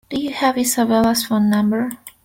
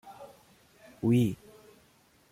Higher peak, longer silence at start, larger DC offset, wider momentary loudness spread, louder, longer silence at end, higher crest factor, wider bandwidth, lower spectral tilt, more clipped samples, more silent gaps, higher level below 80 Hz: first, -4 dBFS vs -16 dBFS; about the same, 0.1 s vs 0.05 s; neither; second, 7 LU vs 24 LU; first, -18 LUFS vs -28 LUFS; second, 0.15 s vs 0.95 s; about the same, 14 dB vs 18 dB; about the same, 17 kHz vs 16 kHz; second, -4 dB/octave vs -8 dB/octave; neither; neither; first, -52 dBFS vs -64 dBFS